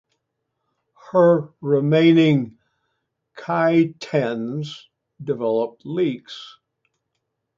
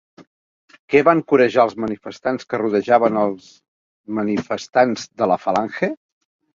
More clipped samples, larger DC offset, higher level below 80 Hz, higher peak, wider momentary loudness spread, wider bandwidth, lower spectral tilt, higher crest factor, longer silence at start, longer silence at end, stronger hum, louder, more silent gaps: neither; neither; second, -68 dBFS vs -60 dBFS; about the same, -4 dBFS vs -2 dBFS; first, 19 LU vs 11 LU; about the same, 7.6 kHz vs 7.6 kHz; first, -8 dB/octave vs -6 dB/octave; about the same, 16 dB vs 18 dB; first, 1.1 s vs 0.2 s; first, 1.1 s vs 0.6 s; neither; about the same, -20 LUFS vs -19 LUFS; second, none vs 0.27-0.68 s, 0.79-0.88 s, 3.68-4.04 s